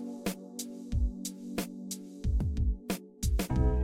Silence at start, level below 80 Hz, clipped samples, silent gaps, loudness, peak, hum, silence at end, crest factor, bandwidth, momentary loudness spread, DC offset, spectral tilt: 0 s; -34 dBFS; under 0.1%; none; -35 LUFS; -14 dBFS; none; 0 s; 18 dB; 16.5 kHz; 10 LU; under 0.1%; -5.5 dB/octave